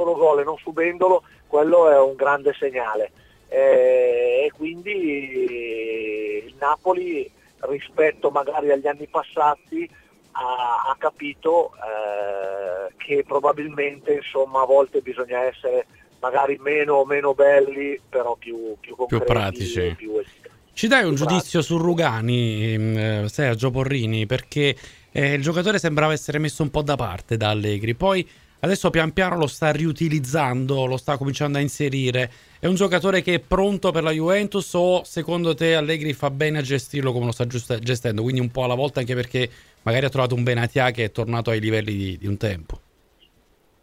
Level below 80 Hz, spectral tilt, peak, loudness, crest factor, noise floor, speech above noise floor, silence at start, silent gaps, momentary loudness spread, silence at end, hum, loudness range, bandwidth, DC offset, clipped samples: -48 dBFS; -6 dB/octave; -2 dBFS; -22 LUFS; 20 dB; -60 dBFS; 39 dB; 0 s; none; 10 LU; 1.05 s; none; 4 LU; 15.5 kHz; under 0.1%; under 0.1%